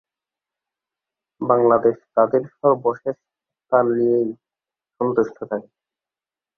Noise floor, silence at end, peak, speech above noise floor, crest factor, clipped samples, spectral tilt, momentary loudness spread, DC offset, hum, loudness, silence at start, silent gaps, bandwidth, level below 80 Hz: under -90 dBFS; 0.95 s; -2 dBFS; over 71 dB; 20 dB; under 0.1%; -10.5 dB/octave; 13 LU; under 0.1%; none; -20 LUFS; 1.4 s; none; 6.2 kHz; -66 dBFS